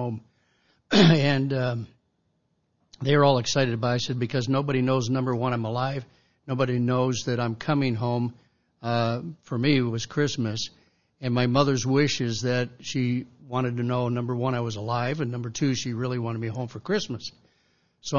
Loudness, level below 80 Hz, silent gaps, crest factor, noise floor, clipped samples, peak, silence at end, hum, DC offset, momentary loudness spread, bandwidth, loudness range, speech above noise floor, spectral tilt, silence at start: -25 LUFS; -60 dBFS; none; 20 dB; -72 dBFS; under 0.1%; -6 dBFS; 0 s; none; 0.2%; 12 LU; 7.4 kHz; 4 LU; 47 dB; -6 dB/octave; 0 s